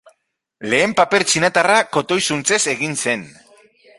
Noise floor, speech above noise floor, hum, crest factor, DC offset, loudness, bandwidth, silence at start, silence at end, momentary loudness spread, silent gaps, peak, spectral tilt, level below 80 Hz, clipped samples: -65 dBFS; 48 dB; none; 18 dB; under 0.1%; -16 LUFS; 11.5 kHz; 0.6 s; 0.7 s; 6 LU; none; 0 dBFS; -2.5 dB/octave; -58 dBFS; under 0.1%